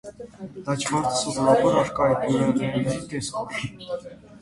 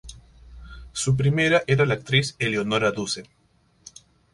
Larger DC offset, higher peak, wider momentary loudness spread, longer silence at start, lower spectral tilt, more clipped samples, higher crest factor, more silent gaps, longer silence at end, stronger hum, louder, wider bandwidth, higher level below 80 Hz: neither; about the same, -6 dBFS vs -6 dBFS; first, 16 LU vs 11 LU; about the same, 0.05 s vs 0.05 s; about the same, -5 dB/octave vs -5 dB/octave; neither; about the same, 18 dB vs 20 dB; neither; second, 0.05 s vs 1.1 s; neither; about the same, -23 LUFS vs -22 LUFS; about the same, 11.5 kHz vs 11.5 kHz; second, -54 dBFS vs -48 dBFS